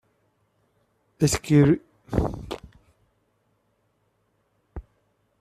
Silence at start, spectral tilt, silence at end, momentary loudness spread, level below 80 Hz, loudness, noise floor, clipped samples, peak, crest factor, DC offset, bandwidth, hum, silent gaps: 1.2 s; -6 dB/octave; 0.6 s; 26 LU; -44 dBFS; -23 LUFS; -70 dBFS; under 0.1%; -6 dBFS; 22 dB; under 0.1%; 14.5 kHz; none; none